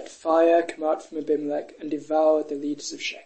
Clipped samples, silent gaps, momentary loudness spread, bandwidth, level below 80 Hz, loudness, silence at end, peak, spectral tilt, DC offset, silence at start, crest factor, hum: under 0.1%; none; 11 LU; 8.8 kHz; -74 dBFS; -24 LUFS; 0.05 s; -8 dBFS; -3.5 dB/octave; 0.2%; 0 s; 16 dB; none